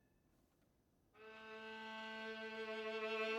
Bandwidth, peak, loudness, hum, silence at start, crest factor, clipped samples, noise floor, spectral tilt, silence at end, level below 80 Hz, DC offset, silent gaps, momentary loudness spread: 15.5 kHz; -32 dBFS; -48 LUFS; none; 1.15 s; 18 dB; under 0.1%; -78 dBFS; -3.5 dB/octave; 0 s; -86 dBFS; under 0.1%; none; 14 LU